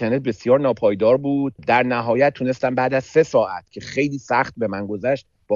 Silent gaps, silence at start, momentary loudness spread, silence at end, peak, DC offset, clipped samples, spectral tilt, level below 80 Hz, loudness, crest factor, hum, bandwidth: none; 0 s; 8 LU; 0 s; -4 dBFS; under 0.1%; under 0.1%; -6.5 dB/octave; -56 dBFS; -20 LUFS; 16 dB; none; 7.4 kHz